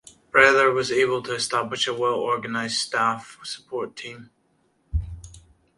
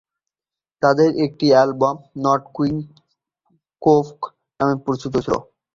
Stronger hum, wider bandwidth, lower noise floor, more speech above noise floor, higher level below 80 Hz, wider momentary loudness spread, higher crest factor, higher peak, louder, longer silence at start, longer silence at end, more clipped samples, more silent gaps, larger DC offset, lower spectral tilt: neither; first, 11.5 kHz vs 7.6 kHz; second, -66 dBFS vs under -90 dBFS; second, 43 dB vs over 72 dB; first, -40 dBFS vs -54 dBFS; first, 19 LU vs 13 LU; first, 24 dB vs 18 dB; about the same, 0 dBFS vs -2 dBFS; second, -22 LUFS vs -19 LUFS; second, 0.35 s vs 0.8 s; about the same, 0.4 s vs 0.35 s; neither; neither; neither; second, -3 dB/octave vs -7 dB/octave